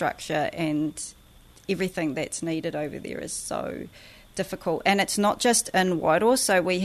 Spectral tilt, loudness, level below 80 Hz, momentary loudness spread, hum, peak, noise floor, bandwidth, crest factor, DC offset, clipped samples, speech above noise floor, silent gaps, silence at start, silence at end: -3.5 dB/octave; -25 LUFS; -56 dBFS; 14 LU; none; -8 dBFS; -52 dBFS; 13.5 kHz; 18 dB; under 0.1%; under 0.1%; 26 dB; none; 0 s; 0 s